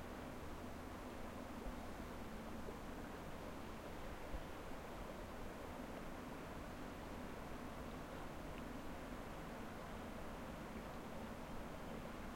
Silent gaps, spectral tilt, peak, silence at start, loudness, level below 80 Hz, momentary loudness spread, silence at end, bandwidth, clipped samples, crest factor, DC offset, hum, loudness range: none; -5.5 dB/octave; -36 dBFS; 0 s; -51 LUFS; -58 dBFS; 1 LU; 0 s; 16.5 kHz; under 0.1%; 14 dB; under 0.1%; none; 0 LU